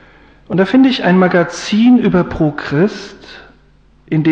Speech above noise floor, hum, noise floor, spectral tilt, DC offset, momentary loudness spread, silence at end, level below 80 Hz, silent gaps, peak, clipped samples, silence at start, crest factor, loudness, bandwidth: 36 dB; none; -48 dBFS; -6.5 dB/octave; under 0.1%; 10 LU; 0 s; -42 dBFS; none; -2 dBFS; under 0.1%; 0.5 s; 12 dB; -13 LUFS; 8.4 kHz